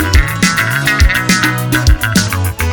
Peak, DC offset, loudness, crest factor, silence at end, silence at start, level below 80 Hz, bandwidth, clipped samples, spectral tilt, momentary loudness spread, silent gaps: 0 dBFS; under 0.1%; -12 LUFS; 12 dB; 0 s; 0 s; -16 dBFS; 19.5 kHz; under 0.1%; -4 dB/octave; 2 LU; none